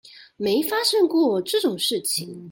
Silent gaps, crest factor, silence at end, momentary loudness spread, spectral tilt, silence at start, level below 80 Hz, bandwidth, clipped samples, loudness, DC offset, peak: none; 16 dB; 0 s; 6 LU; -3 dB/octave; 0.15 s; -68 dBFS; 17 kHz; under 0.1%; -22 LUFS; under 0.1%; -8 dBFS